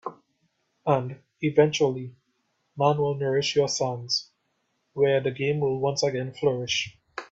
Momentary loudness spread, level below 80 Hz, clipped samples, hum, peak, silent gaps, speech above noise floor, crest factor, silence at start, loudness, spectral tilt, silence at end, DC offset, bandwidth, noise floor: 13 LU; -64 dBFS; under 0.1%; none; -6 dBFS; none; 50 dB; 20 dB; 0.05 s; -25 LUFS; -4.5 dB/octave; 0.05 s; under 0.1%; 8 kHz; -74 dBFS